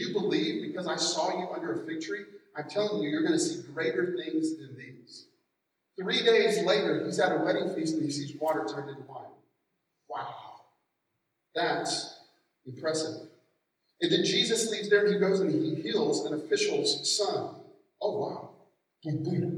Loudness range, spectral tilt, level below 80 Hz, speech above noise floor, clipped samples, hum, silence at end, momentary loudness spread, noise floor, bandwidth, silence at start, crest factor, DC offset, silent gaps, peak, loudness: 9 LU; -4 dB/octave; -88 dBFS; 52 dB; under 0.1%; none; 0 s; 17 LU; -81 dBFS; 14 kHz; 0 s; 20 dB; under 0.1%; none; -10 dBFS; -29 LUFS